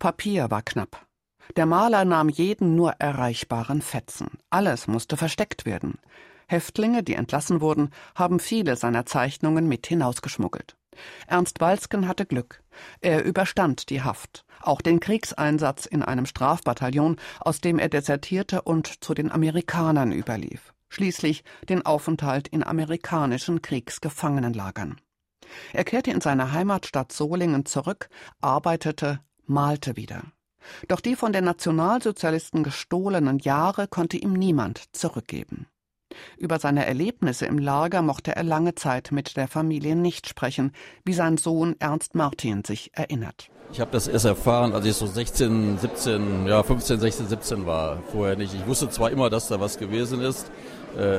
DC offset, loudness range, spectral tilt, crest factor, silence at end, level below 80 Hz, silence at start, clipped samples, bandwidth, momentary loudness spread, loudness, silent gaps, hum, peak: under 0.1%; 4 LU; -5.5 dB/octave; 20 dB; 0 s; -46 dBFS; 0 s; under 0.1%; 16 kHz; 10 LU; -25 LUFS; none; none; -6 dBFS